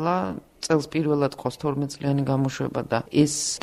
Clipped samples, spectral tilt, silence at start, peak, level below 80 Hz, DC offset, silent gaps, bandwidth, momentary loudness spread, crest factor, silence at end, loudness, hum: under 0.1%; -5 dB/octave; 0 s; -6 dBFS; -56 dBFS; under 0.1%; none; 14.5 kHz; 7 LU; 18 dB; 0 s; -25 LUFS; none